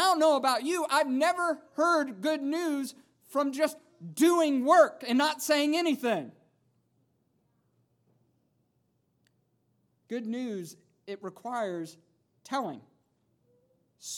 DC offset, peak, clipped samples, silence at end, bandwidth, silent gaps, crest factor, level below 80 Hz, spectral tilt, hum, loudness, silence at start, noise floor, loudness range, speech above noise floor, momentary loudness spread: under 0.1%; -8 dBFS; under 0.1%; 0 s; 18.5 kHz; none; 22 dB; under -90 dBFS; -3.5 dB/octave; none; -28 LUFS; 0 s; -74 dBFS; 16 LU; 46 dB; 18 LU